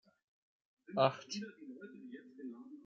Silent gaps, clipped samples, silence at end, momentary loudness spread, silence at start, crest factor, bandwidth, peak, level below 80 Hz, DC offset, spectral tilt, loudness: none; under 0.1%; 0 s; 19 LU; 0.9 s; 28 dB; 7.6 kHz; -14 dBFS; -90 dBFS; under 0.1%; -4 dB/octave; -37 LUFS